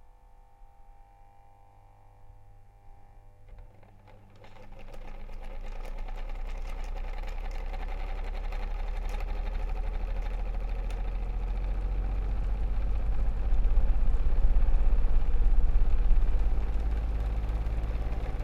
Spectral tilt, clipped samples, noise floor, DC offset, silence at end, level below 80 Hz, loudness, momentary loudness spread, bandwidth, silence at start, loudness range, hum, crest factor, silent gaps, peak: -7.5 dB/octave; under 0.1%; -54 dBFS; under 0.1%; 0 s; -28 dBFS; -34 LUFS; 17 LU; 4.4 kHz; 0.6 s; 17 LU; none; 16 dB; none; -10 dBFS